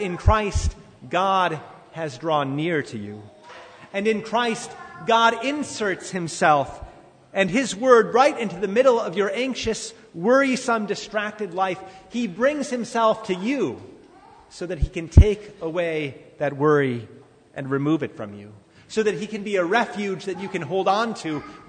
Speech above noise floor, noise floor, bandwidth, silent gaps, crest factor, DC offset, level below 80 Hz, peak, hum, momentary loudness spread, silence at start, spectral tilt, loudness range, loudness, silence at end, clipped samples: 27 dB; -49 dBFS; 9.6 kHz; none; 22 dB; under 0.1%; -34 dBFS; -2 dBFS; none; 15 LU; 0 s; -5.5 dB/octave; 5 LU; -23 LUFS; 0.05 s; under 0.1%